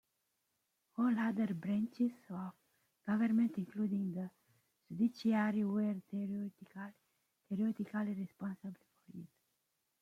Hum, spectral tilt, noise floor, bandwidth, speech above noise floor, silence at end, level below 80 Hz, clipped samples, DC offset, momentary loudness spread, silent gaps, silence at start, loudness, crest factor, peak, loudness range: none; -8.5 dB/octave; -84 dBFS; 6.8 kHz; 47 dB; 0.75 s; -82 dBFS; under 0.1%; under 0.1%; 17 LU; none; 1 s; -37 LUFS; 18 dB; -22 dBFS; 6 LU